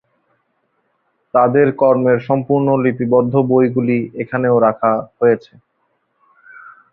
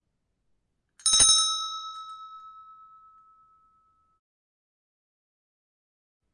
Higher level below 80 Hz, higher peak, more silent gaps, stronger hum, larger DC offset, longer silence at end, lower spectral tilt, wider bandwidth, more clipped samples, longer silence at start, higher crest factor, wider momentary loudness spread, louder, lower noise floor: first, -56 dBFS vs -62 dBFS; first, -2 dBFS vs -8 dBFS; neither; neither; neither; second, 0.25 s vs 3.75 s; first, -11.5 dB/octave vs 2 dB/octave; second, 4.5 kHz vs 11.5 kHz; neither; first, 1.35 s vs 1.05 s; second, 14 dB vs 24 dB; second, 6 LU vs 26 LU; first, -15 LUFS vs -20 LUFS; second, -66 dBFS vs -77 dBFS